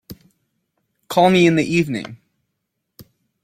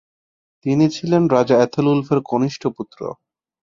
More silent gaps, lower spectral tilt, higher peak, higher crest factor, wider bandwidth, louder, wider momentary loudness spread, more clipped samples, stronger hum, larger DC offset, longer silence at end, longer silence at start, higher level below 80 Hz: neither; second, -6 dB/octave vs -7.5 dB/octave; about the same, -2 dBFS vs -2 dBFS; about the same, 18 dB vs 18 dB; first, 15.5 kHz vs 7.6 kHz; about the same, -17 LUFS vs -18 LUFS; about the same, 14 LU vs 15 LU; neither; neither; neither; second, 0.4 s vs 0.65 s; second, 0.1 s vs 0.65 s; about the same, -56 dBFS vs -60 dBFS